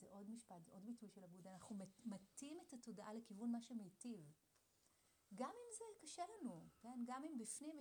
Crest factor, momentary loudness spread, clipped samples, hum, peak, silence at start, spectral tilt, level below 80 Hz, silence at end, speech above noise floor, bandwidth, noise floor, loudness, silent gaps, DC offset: 20 dB; 10 LU; under 0.1%; none; -36 dBFS; 0 s; -4.5 dB/octave; under -90 dBFS; 0 s; 26 dB; over 20 kHz; -80 dBFS; -55 LUFS; none; under 0.1%